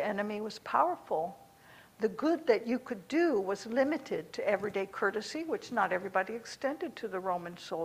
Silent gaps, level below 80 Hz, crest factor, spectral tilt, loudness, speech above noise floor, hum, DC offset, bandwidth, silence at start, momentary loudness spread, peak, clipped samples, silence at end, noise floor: none; -74 dBFS; 20 dB; -5 dB/octave; -33 LUFS; 25 dB; none; under 0.1%; 15.5 kHz; 0 s; 8 LU; -12 dBFS; under 0.1%; 0 s; -58 dBFS